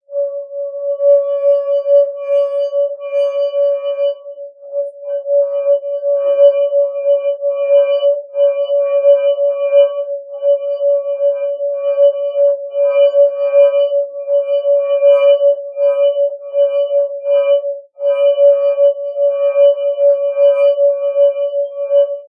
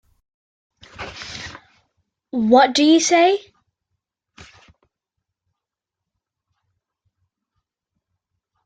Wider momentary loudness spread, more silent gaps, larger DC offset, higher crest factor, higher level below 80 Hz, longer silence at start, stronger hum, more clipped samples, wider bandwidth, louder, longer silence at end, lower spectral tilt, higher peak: second, 8 LU vs 21 LU; neither; neither; second, 12 dB vs 20 dB; second, under -90 dBFS vs -60 dBFS; second, 0.1 s vs 1 s; neither; neither; second, 3.2 kHz vs 9.4 kHz; about the same, -14 LUFS vs -15 LUFS; second, 0.05 s vs 5.3 s; second, -1 dB/octave vs -3 dB/octave; about the same, 0 dBFS vs -2 dBFS